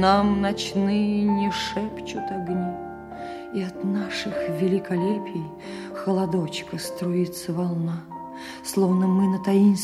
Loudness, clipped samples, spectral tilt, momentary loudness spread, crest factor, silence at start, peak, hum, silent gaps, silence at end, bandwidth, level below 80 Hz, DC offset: -25 LUFS; under 0.1%; -6 dB/octave; 15 LU; 18 dB; 0 s; -6 dBFS; none; none; 0 s; 14 kHz; -52 dBFS; under 0.1%